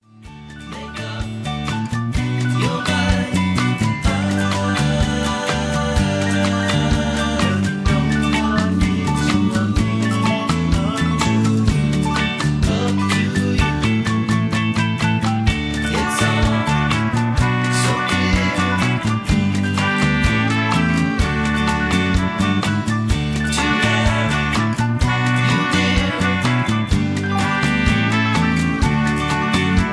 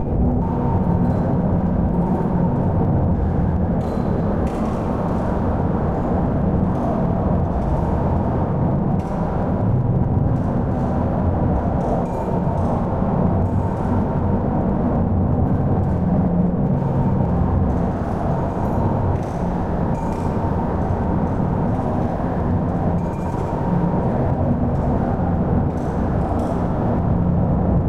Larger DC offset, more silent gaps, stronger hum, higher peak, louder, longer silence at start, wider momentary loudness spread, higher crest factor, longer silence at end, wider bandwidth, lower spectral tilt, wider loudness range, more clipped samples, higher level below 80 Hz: second, under 0.1% vs 0.7%; neither; neither; first, -2 dBFS vs -6 dBFS; about the same, -18 LUFS vs -20 LUFS; first, 0.2 s vs 0 s; about the same, 3 LU vs 3 LU; about the same, 16 dB vs 12 dB; about the same, 0 s vs 0 s; first, 11 kHz vs 7 kHz; second, -5.5 dB/octave vs -10.5 dB/octave; about the same, 1 LU vs 2 LU; neither; about the same, -30 dBFS vs -28 dBFS